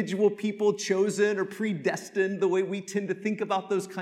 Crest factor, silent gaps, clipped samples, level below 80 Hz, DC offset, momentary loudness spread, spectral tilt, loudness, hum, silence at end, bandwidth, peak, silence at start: 16 dB; none; under 0.1%; -84 dBFS; under 0.1%; 5 LU; -5 dB/octave; -28 LUFS; none; 0 s; 13.5 kHz; -12 dBFS; 0 s